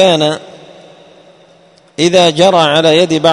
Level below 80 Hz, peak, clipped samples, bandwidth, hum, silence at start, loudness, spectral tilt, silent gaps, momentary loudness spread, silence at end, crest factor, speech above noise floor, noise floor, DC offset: -52 dBFS; 0 dBFS; 0.3%; 11 kHz; none; 0 s; -9 LUFS; -4.5 dB/octave; none; 10 LU; 0 s; 12 dB; 36 dB; -45 dBFS; under 0.1%